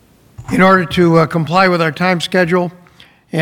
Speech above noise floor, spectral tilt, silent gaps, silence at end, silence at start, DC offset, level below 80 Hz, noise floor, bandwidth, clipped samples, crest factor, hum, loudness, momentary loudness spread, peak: 33 dB; -6.5 dB/octave; none; 0 s; 0.4 s; under 0.1%; -44 dBFS; -45 dBFS; 16.5 kHz; under 0.1%; 14 dB; none; -13 LUFS; 8 LU; 0 dBFS